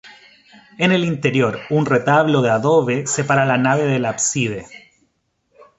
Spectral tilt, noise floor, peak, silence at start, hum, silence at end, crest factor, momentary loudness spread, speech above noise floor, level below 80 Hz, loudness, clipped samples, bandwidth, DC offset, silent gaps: -5 dB/octave; -67 dBFS; -2 dBFS; 0.05 s; none; 1 s; 16 dB; 5 LU; 50 dB; -58 dBFS; -17 LUFS; under 0.1%; 8.2 kHz; under 0.1%; none